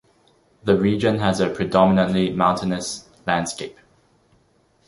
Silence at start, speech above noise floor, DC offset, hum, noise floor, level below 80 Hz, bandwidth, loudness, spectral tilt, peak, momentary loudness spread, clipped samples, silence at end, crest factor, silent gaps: 0.65 s; 41 dB; under 0.1%; none; -61 dBFS; -50 dBFS; 11.5 kHz; -20 LUFS; -5.5 dB/octave; -2 dBFS; 13 LU; under 0.1%; 1.15 s; 20 dB; none